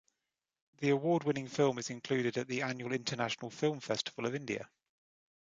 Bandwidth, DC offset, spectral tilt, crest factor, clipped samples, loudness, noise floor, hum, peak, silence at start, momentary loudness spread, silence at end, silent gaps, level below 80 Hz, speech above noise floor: 9.4 kHz; under 0.1%; -5 dB/octave; 20 dB; under 0.1%; -35 LUFS; -89 dBFS; none; -16 dBFS; 0.8 s; 7 LU; 0.75 s; none; -78 dBFS; 55 dB